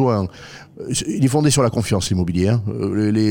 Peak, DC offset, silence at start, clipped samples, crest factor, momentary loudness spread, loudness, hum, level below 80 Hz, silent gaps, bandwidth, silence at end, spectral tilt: -4 dBFS; under 0.1%; 0 s; under 0.1%; 14 dB; 14 LU; -19 LUFS; none; -46 dBFS; none; 17 kHz; 0 s; -5.5 dB/octave